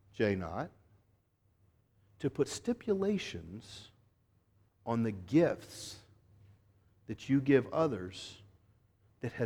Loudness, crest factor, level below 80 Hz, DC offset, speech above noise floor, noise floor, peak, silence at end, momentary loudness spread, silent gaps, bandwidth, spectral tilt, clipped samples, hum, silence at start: -34 LUFS; 22 dB; -66 dBFS; under 0.1%; 39 dB; -73 dBFS; -14 dBFS; 0 s; 19 LU; none; 14.5 kHz; -6.5 dB/octave; under 0.1%; none; 0.15 s